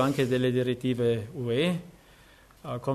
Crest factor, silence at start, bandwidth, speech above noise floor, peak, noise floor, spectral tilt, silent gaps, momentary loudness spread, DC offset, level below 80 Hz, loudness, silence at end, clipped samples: 16 dB; 0 s; 13.5 kHz; 29 dB; -12 dBFS; -55 dBFS; -6.5 dB/octave; none; 10 LU; under 0.1%; -60 dBFS; -28 LUFS; 0 s; under 0.1%